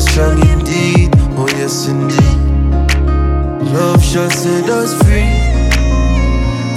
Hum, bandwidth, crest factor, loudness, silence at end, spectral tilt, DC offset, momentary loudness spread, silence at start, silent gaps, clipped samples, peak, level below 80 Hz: none; 15 kHz; 10 dB; -12 LUFS; 0 s; -5.5 dB/octave; under 0.1%; 4 LU; 0 s; none; under 0.1%; 0 dBFS; -14 dBFS